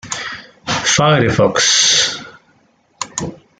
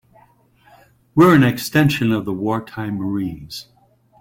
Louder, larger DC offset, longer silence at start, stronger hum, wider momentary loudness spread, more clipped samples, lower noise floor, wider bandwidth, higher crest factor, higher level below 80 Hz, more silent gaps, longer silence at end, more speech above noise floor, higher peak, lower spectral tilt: first, -13 LUFS vs -18 LUFS; neither; second, 0.05 s vs 1.15 s; neither; about the same, 18 LU vs 17 LU; neither; about the same, -56 dBFS vs -54 dBFS; second, 10.5 kHz vs 17 kHz; about the same, 16 dB vs 16 dB; about the same, -48 dBFS vs -50 dBFS; neither; second, 0.25 s vs 0.6 s; first, 43 dB vs 37 dB; about the same, 0 dBFS vs -2 dBFS; second, -2.5 dB/octave vs -6.5 dB/octave